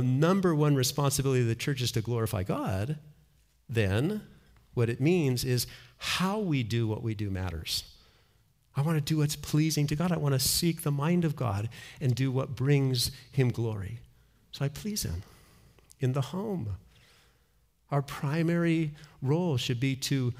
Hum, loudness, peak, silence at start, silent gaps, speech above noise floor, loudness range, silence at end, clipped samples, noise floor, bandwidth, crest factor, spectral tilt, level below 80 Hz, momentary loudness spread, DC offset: none; -29 LUFS; -14 dBFS; 0 s; none; 40 dB; 7 LU; 0 s; under 0.1%; -68 dBFS; 16 kHz; 16 dB; -5.5 dB/octave; -56 dBFS; 10 LU; under 0.1%